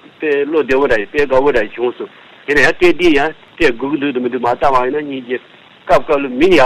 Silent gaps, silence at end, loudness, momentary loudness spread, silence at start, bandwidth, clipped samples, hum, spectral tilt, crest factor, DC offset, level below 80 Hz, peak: none; 0 s; -14 LUFS; 11 LU; 0 s; 14 kHz; under 0.1%; none; -5 dB/octave; 14 dB; 4%; -38 dBFS; 0 dBFS